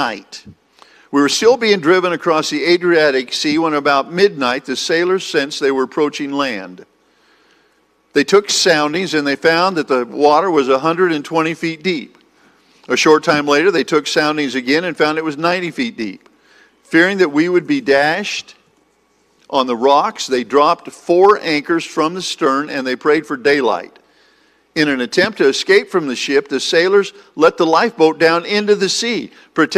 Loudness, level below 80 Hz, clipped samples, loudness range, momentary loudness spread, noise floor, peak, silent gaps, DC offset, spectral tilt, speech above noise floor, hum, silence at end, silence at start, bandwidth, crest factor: -15 LUFS; -62 dBFS; under 0.1%; 3 LU; 8 LU; -58 dBFS; 0 dBFS; none; under 0.1%; -3.5 dB/octave; 43 dB; none; 0 s; 0 s; 14.5 kHz; 16 dB